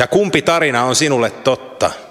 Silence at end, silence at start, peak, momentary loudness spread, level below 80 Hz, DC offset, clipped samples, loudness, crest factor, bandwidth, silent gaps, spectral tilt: 0.05 s; 0 s; 0 dBFS; 6 LU; -52 dBFS; under 0.1%; under 0.1%; -15 LUFS; 16 dB; 15.5 kHz; none; -3.5 dB/octave